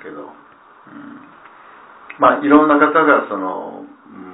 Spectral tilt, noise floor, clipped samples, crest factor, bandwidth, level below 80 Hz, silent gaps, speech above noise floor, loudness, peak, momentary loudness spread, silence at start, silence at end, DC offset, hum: -9.5 dB/octave; -46 dBFS; under 0.1%; 18 dB; 4 kHz; -58 dBFS; none; 32 dB; -14 LUFS; 0 dBFS; 25 LU; 0.05 s; 0 s; under 0.1%; none